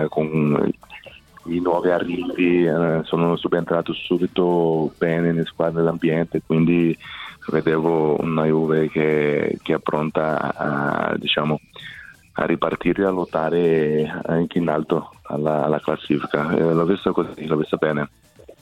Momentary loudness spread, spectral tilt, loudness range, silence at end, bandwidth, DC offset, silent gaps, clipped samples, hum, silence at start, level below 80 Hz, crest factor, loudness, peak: 7 LU; -8 dB/octave; 2 LU; 0.1 s; 10 kHz; under 0.1%; none; under 0.1%; none; 0 s; -52 dBFS; 16 dB; -21 LUFS; -4 dBFS